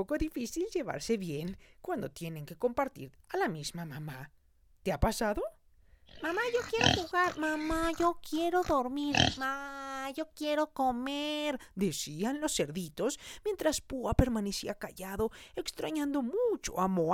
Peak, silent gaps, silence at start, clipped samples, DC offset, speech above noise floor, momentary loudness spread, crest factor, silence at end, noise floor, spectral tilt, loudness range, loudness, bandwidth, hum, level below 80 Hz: -8 dBFS; none; 0 s; under 0.1%; under 0.1%; 29 dB; 11 LU; 26 dB; 0 s; -61 dBFS; -4.5 dB/octave; 6 LU; -33 LUFS; 18 kHz; none; -48 dBFS